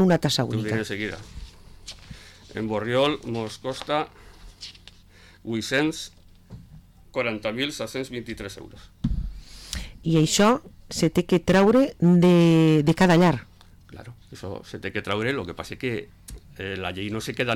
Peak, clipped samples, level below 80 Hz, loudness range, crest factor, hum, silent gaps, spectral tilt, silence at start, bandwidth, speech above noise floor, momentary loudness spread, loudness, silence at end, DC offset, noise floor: -12 dBFS; under 0.1%; -44 dBFS; 12 LU; 14 dB; none; none; -5.5 dB/octave; 0 s; 14.5 kHz; 28 dB; 24 LU; -23 LUFS; 0 s; under 0.1%; -51 dBFS